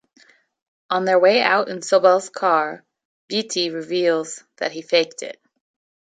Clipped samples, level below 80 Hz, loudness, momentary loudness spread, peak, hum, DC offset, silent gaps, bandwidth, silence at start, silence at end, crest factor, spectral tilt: under 0.1%; -76 dBFS; -19 LUFS; 13 LU; -2 dBFS; none; under 0.1%; 3.05-3.28 s; 9.4 kHz; 0.9 s; 0.8 s; 20 dB; -3 dB/octave